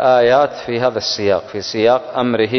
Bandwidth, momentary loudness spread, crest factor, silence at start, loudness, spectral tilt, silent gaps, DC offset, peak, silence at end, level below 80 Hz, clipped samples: 6.4 kHz; 7 LU; 14 dB; 0 s; -16 LUFS; -4.5 dB/octave; none; under 0.1%; -2 dBFS; 0 s; -52 dBFS; under 0.1%